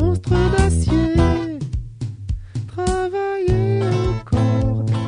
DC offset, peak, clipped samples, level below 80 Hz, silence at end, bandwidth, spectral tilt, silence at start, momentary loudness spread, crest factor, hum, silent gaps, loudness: under 0.1%; 0 dBFS; under 0.1%; -26 dBFS; 0 s; 10 kHz; -7 dB/octave; 0 s; 11 LU; 18 dB; none; none; -20 LUFS